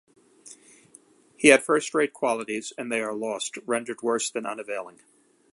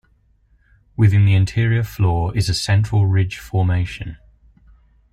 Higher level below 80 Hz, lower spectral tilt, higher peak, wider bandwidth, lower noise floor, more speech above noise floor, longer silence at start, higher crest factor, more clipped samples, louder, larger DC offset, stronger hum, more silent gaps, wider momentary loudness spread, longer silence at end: second, -72 dBFS vs -38 dBFS; second, -2.5 dB/octave vs -6 dB/octave; about the same, -2 dBFS vs -4 dBFS; second, 11.5 kHz vs 13.5 kHz; about the same, -56 dBFS vs -58 dBFS; second, 31 dB vs 41 dB; second, 0.45 s vs 1 s; first, 24 dB vs 14 dB; neither; second, -25 LUFS vs -18 LUFS; neither; neither; neither; first, 15 LU vs 10 LU; second, 0.65 s vs 1 s